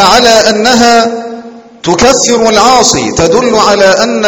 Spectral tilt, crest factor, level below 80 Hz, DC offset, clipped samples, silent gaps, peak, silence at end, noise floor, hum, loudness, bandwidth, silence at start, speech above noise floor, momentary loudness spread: -2.5 dB/octave; 6 dB; -34 dBFS; under 0.1%; 4%; none; 0 dBFS; 0 s; -27 dBFS; none; -6 LUFS; over 20 kHz; 0 s; 21 dB; 10 LU